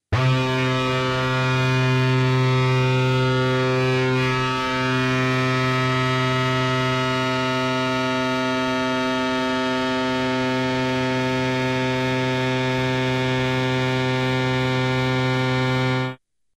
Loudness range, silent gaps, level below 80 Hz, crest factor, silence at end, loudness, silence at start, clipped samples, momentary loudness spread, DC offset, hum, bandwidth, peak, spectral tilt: 2 LU; none; -48 dBFS; 10 dB; 0.4 s; -21 LUFS; 0.1 s; under 0.1%; 3 LU; under 0.1%; none; 10 kHz; -10 dBFS; -6 dB/octave